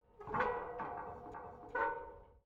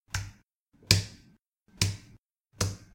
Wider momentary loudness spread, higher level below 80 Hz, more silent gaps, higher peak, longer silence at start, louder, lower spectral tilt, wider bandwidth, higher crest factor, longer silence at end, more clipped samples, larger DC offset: second, 13 LU vs 19 LU; second, -64 dBFS vs -50 dBFS; second, none vs 0.60-0.66 s, 1.47-1.52 s, 2.18-2.24 s, 2.40-2.45 s; second, -22 dBFS vs -2 dBFS; about the same, 0.15 s vs 0.15 s; second, -41 LUFS vs -29 LUFS; first, -7 dB/octave vs -3 dB/octave; second, 7.4 kHz vs 16.5 kHz; second, 20 dB vs 32 dB; about the same, 0.05 s vs 0.1 s; neither; neither